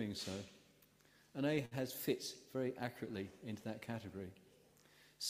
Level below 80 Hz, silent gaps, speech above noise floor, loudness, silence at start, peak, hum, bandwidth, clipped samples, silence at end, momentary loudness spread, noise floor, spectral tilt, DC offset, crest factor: -78 dBFS; none; 27 dB; -44 LUFS; 0 s; -24 dBFS; none; 15.5 kHz; under 0.1%; 0 s; 12 LU; -70 dBFS; -5 dB/octave; under 0.1%; 22 dB